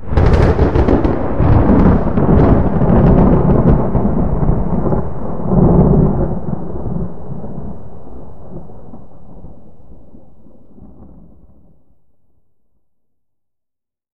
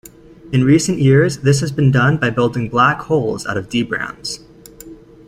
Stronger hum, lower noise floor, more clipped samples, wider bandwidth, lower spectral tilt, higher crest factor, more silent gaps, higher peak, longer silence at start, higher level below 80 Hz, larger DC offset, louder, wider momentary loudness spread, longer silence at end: neither; first, -80 dBFS vs -38 dBFS; neither; second, 6.4 kHz vs 15.5 kHz; first, -11 dB/octave vs -6 dB/octave; about the same, 14 dB vs 14 dB; neither; about the same, 0 dBFS vs -2 dBFS; second, 0 s vs 0.45 s; first, -20 dBFS vs -46 dBFS; first, 8% vs under 0.1%; first, -13 LUFS vs -16 LUFS; first, 19 LU vs 10 LU; second, 0.05 s vs 0.35 s